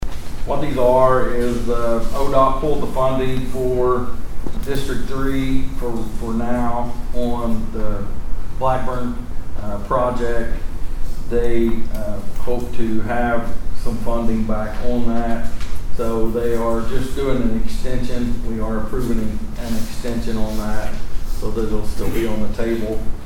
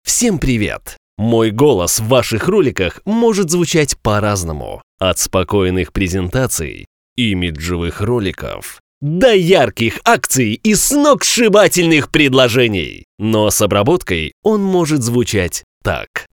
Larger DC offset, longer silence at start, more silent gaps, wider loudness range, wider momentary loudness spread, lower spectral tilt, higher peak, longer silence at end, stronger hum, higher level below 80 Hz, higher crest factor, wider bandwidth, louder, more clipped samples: second, under 0.1% vs 0.1%; about the same, 0 s vs 0.05 s; second, none vs 0.97-1.17 s, 4.83-4.98 s, 6.87-7.16 s, 8.80-9.01 s, 13.04-13.18 s, 14.33-14.43 s, 15.63-15.81 s, 16.07-16.14 s; about the same, 6 LU vs 6 LU; about the same, 11 LU vs 11 LU; first, -6.5 dB/octave vs -4 dB/octave; about the same, 0 dBFS vs 0 dBFS; about the same, 0 s vs 0.1 s; neither; first, -22 dBFS vs -34 dBFS; about the same, 14 dB vs 14 dB; second, 13.5 kHz vs over 20 kHz; second, -23 LUFS vs -14 LUFS; neither